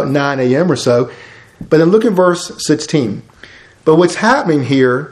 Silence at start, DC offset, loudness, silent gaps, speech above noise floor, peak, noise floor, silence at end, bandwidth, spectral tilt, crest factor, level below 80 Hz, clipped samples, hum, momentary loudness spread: 0 s; under 0.1%; -13 LUFS; none; 28 dB; 0 dBFS; -40 dBFS; 0 s; 13 kHz; -5.5 dB/octave; 14 dB; -52 dBFS; under 0.1%; none; 8 LU